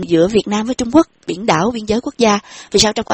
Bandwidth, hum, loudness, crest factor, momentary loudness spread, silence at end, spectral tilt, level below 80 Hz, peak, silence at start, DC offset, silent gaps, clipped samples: 8.6 kHz; none; -15 LUFS; 16 dB; 6 LU; 0 s; -4 dB/octave; -42 dBFS; 0 dBFS; 0 s; under 0.1%; none; under 0.1%